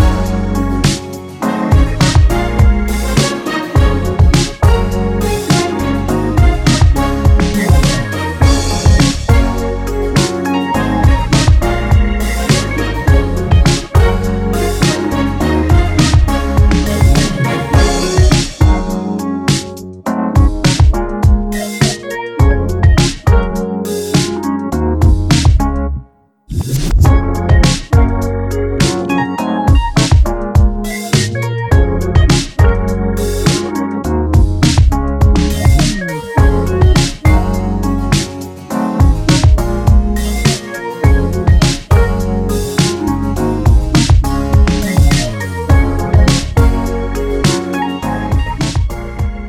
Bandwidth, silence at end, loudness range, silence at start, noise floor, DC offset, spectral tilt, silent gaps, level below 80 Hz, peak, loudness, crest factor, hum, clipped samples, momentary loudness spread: 15.5 kHz; 0 s; 2 LU; 0 s; -41 dBFS; under 0.1%; -5.5 dB/octave; none; -16 dBFS; 0 dBFS; -13 LUFS; 12 dB; none; under 0.1%; 7 LU